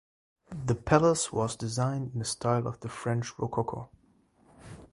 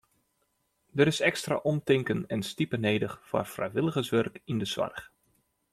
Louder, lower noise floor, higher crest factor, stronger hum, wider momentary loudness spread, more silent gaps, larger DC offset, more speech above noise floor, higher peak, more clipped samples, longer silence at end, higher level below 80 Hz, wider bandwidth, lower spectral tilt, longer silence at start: about the same, -30 LUFS vs -29 LUFS; second, -65 dBFS vs -75 dBFS; about the same, 24 dB vs 22 dB; neither; first, 19 LU vs 7 LU; neither; neither; second, 36 dB vs 47 dB; about the same, -8 dBFS vs -8 dBFS; neither; second, 0.05 s vs 0.65 s; first, -54 dBFS vs -64 dBFS; second, 11.5 kHz vs 15 kHz; about the same, -5.5 dB/octave vs -5.5 dB/octave; second, 0.5 s vs 0.95 s